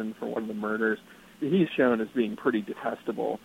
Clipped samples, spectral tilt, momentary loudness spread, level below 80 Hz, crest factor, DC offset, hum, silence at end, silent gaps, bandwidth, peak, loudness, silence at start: under 0.1%; -7.5 dB/octave; 9 LU; -68 dBFS; 18 dB; under 0.1%; none; 0.05 s; none; 16 kHz; -10 dBFS; -28 LUFS; 0 s